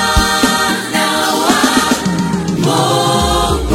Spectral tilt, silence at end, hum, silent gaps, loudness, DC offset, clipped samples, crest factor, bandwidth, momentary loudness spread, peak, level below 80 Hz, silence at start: -3.5 dB/octave; 0 s; none; none; -13 LUFS; under 0.1%; under 0.1%; 12 dB; 16.5 kHz; 4 LU; 0 dBFS; -26 dBFS; 0 s